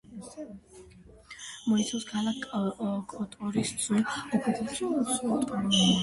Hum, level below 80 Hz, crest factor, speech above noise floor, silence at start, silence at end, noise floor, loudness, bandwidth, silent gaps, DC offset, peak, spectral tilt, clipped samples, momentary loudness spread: none; -60 dBFS; 18 dB; 22 dB; 0.05 s; 0 s; -51 dBFS; -29 LUFS; 11.5 kHz; none; under 0.1%; -12 dBFS; -4 dB/octave; under 0.1%; 16 LU